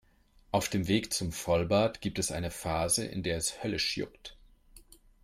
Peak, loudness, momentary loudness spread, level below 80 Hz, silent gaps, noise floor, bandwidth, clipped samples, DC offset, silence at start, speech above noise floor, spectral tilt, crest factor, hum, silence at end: -14 dBFS; -31 LUFS; 7 LU; -52 dBFS; none; -63 dBFS; 16.5 kHz; under 0.1%; under 0.1%; 0.55 s; 31 dB; -4 dB/octave; 18 dB; none; 0.4 s